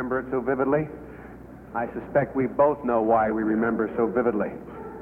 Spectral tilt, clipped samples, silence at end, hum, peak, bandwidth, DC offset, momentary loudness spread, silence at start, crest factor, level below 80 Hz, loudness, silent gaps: -10.5 dB/octave; under 0.1%; 0 s; none; -8 dBFS; 3.6 kHz; under 0.1%; 18 LU; 0 s; 16 dB; -52 dBFS; -25 LUFS; none